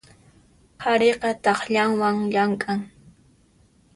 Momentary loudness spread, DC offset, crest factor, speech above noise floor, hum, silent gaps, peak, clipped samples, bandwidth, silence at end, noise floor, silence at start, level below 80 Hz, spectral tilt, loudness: 9 LU; under 0.1%; 18 dB; 37 dB; none; none; -6 dBFS; under 0.1%; 11.5 kHz; 1.1 s; -58 dBFS; 0.8 s; -62 dBFS; -5 dB/octave; -22 LUFS